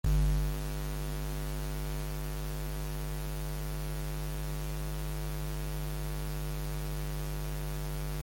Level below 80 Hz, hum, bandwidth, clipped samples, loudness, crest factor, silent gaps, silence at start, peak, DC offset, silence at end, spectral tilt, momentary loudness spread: -36 dBFS; none; 17 kHz; under 0.1%; -37 LUFS; 16 dB; none; 0.05 s; -20 dBFS; under 0.1%; 0 s; -5.5 dB/octave; 2 LU